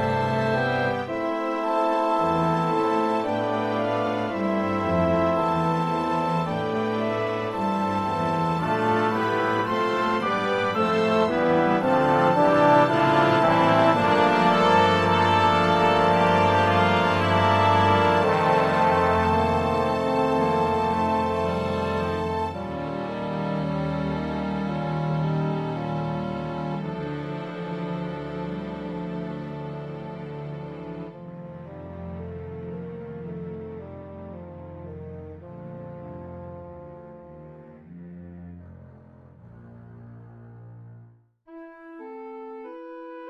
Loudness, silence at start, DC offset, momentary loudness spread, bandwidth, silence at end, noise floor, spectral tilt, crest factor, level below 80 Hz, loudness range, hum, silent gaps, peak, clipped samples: -23 LUFS; 0 s; under 0.1%; 20 LU; 14 kHz; 0 s; -53 dBFS; -6.5 dB/octave; 18 dB; -46 dBFS; 20 LU; none; none; -6 dBFS; under 0.1%